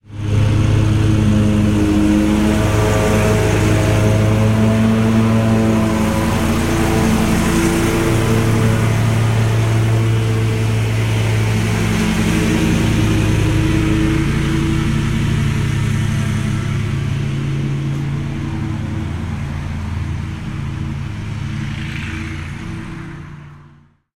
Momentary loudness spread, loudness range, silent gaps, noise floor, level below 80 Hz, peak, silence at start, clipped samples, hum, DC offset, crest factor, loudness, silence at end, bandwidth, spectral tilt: 10 LU; 10 LU; none; -47 dBFS; -28 dBFS; -2 dBFS; 0.1 s; under 0.1%; none; under 0.1%; 14 dB; -16 LUFS; 0.55 s; 16 kHz; -6.5 dB/octave